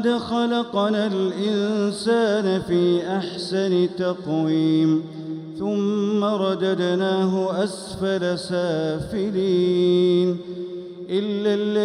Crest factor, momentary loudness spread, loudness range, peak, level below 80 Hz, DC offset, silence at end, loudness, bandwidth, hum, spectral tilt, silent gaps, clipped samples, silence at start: 12 dB; 8 LU; 1 LU; -10 dBFS; -58 dBFS; under 0.1%; 0 s; -22 LUFS; 11 kHz; none; -6.5 dB/octave; none; under 0.1%; 0 s